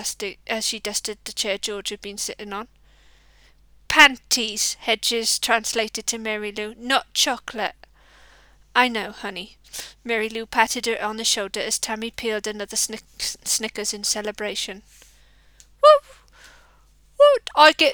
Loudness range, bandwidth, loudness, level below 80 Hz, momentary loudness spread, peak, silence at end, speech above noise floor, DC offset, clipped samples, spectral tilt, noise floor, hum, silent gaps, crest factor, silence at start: 7 LU; over 20 kHz; -21 LUFS; -54 dBFS; 16 LU; 0 dBFS; 0 s; 32 dB; under 0.1%; under 0.1%; -0.5 dB/octave; -55 dBFS; none; none; 24 dB; 0 s